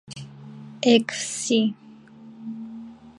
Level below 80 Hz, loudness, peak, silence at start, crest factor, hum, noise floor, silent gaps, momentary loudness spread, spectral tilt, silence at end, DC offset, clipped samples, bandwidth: -70 dBFS; -22 LUFS; -2 dBFS; 0.1 s; 24 dB; none; -46 dBFS; none; 23 LU; -3.5 dB/octave; 0.05 s; under 0.1%; under 0.1%; 11.5 kHz